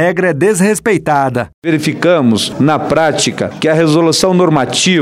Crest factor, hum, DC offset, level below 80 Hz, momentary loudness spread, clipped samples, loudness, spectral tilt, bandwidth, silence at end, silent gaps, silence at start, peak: 10 dB; none; under 0.1%; -48 dBFS; 5 LU; under 0.1%; -12 LUFS; -4.5 dB/octave; 15.5 kHz; 0 s; 1.54-1.62 s; 0 s; -2 dBFS